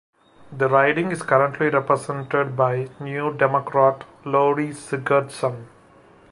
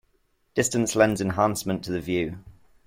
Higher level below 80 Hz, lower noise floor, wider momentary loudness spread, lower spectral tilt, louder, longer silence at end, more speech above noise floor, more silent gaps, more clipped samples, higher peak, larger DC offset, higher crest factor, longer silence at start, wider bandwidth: second, -64 dBFS vs -54 dBFS; second, -51 dBFS vs -68 dBFS; about the same, 9 LU vs 9 LU; first, -6.5 dB/octave vs -4.5 dB/octave; first, -21 LUFS vs -25 LUFS; first, 0.65 s vs 0.35 s; second, 30 dB vs 44 dB; neither; neither; first, -2 dBFS vs -6 dBFS; neither; about the same, 20 dB vs 20 dB; about the same, 0.5 s vs 0.55 s; second, 11.5 kHz vs 16.5 kHz